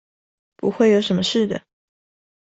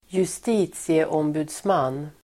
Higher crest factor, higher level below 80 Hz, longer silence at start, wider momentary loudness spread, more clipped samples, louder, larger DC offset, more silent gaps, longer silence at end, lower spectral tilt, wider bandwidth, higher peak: about the same, 18 dB vs 16 dB; about the same, -60 dBFS vs -60 dBFS; first, 0.65 s vs 0.1 s; first, 10 LU vs 4 LU; neither; first, -19 LUFS vs -24 LUFS; neither; neither; first, 0.85 s vs 0.15 s; about the same, -5.5 dB/octave vs -5.5 dB/octave; second, 8.2 kHz vs 15 kHz; first, -4 dBFS vs -8 dBFS